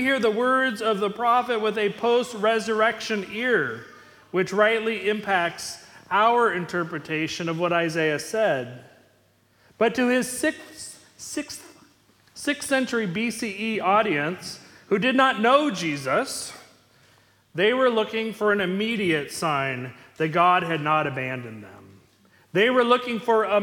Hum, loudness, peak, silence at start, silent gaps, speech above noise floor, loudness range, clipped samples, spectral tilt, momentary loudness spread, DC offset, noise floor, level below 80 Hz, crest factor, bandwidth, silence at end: none; -23 LUFS; -4 dBFS; 0 s; none; 38 dB; 5 LU; under 0.1%; -4 dB/octave; 14 LU; under 0.1%; -62 dBFS; -66 dBFS; 20 dB; 18 kHz; 0 s